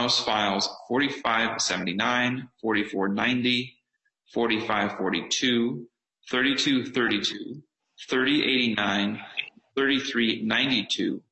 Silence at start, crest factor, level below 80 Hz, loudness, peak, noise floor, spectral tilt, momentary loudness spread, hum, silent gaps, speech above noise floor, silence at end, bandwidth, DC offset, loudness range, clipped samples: 0 s; 18 dB; -66 dBFS; -25 LUFS; -8 dBFS; -74 dBFS; -3 dB/octave; 10 LU; none; none; 49 dB; 0.15 s; 8.4 kHz; under 0.1%; 2 LU; under 0.1%